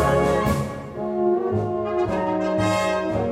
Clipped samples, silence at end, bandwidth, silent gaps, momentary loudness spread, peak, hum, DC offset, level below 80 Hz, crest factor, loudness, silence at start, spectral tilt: under 0.1%; 0 s; 16 kHz; none; 6 LU; -8 dBFS; none; under 0.1%; -40 dBFS; 14 dB; -23 LUFS; 0 s; -6.5 dB/octave